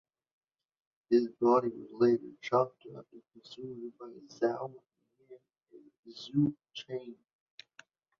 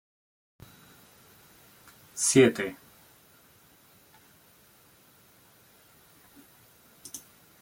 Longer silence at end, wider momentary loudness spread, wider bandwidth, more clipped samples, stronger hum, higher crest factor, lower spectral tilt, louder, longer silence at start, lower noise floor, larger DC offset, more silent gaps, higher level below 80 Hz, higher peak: first, 1.05 s vs 0.45 s; second, 24 LU vs 29 LU; second, 7 kHz vs 17 kHz; neither; neither; second, 20 dB vs 26 dB; first, -7.5 dB/octave vs -4 dB/octave; second, -32 LUFS vs -24 LUFS; second, 1.1 s vs 2.15 s; about the same, -62 dBFS vs -59 dBFS; neither; first, 5.99-6.03 s vs none; second, -76 dBFS vs -70 dBFS; second, -14 dBFS vs -8 dBFS